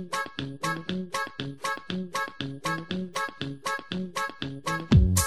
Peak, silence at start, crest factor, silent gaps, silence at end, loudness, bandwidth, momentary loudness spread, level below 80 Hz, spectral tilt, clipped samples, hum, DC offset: -8 dBFS; 0 s; 20 dB; none; 0 s; -30 LUFS; 13 kHz; 8 LU; -36 dBFS; -4.5 dB/octave; under 0.1%; none; 0.3%